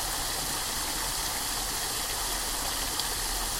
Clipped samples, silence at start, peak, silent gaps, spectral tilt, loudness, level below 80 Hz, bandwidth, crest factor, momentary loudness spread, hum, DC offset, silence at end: under 0.1%; 0 s; -10 dBFS; none; -0.5 dB/octave; -29 LUFS; -42 dBFS; 16.5 kHz; 20 dB; 1 LU; none; under 0.1%; 0 s